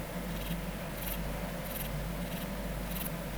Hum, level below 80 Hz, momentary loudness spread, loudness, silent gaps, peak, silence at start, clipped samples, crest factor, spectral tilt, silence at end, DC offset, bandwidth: none; -42 dBFS; 2 LU; -38 LUFS; none; -22 dBFS; 0 s; under 0.1%; 16 dB; -5 dB/octave; 0 s; under 0.1%; over 20 kHz